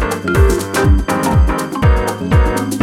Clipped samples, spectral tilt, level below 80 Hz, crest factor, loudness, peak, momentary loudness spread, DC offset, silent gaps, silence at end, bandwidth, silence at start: under 0.1%; -6 dB/octave; -16 dBFS; 12 dB; -14 LUFS; 0 dBFS; 3 LU; under 0.1%; none; 0 s; 16 kHz; 0 s